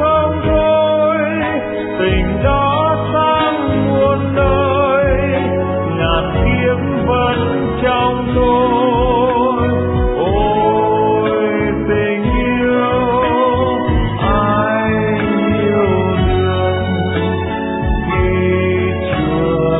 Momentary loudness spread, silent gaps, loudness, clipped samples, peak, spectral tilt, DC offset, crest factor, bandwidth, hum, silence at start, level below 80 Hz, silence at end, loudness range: 4 LU; none; -15 LUFS; under 0.1%; -2 dBFS; -11 dB/octave; under 0.1%; 12 dB; 4 kHz; none; 0 s; -26 dBFS; 0 s; 2 LU